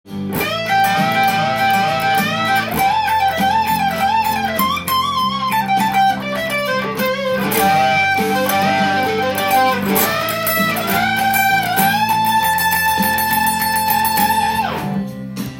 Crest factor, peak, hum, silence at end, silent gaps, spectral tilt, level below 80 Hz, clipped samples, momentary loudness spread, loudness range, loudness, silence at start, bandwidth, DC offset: 16 dB; 0 dBFS; none; 0 s; none; -3.5 dB/octave; -48 dBFS; under 0.1%; 4 LU; 2 LU; -16 LUFS; 0.05 s; 17 kHz; under 0.1%